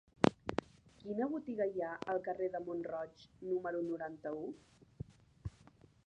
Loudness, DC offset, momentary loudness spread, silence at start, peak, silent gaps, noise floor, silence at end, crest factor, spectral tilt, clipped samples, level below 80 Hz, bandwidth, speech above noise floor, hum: -40 LUFS; under 0.1%; 16 LU; 0.2 s; -8 dBFS; none; -64 dBFS; 0.6 s; 32 dB; -7 dB/octave; under 0.1%; -64 dBFS; 9.6 kHz; 24 dB; none